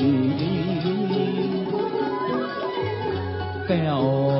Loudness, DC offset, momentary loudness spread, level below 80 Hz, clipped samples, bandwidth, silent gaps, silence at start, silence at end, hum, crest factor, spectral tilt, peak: -24 LUFS; under 0.1%; 6 LU; -56 dBFS; under 0.1%; 5.8 kHz; none; 0 s; 0 s; none; 14 dB; -12 dB/octave; -10 dBFS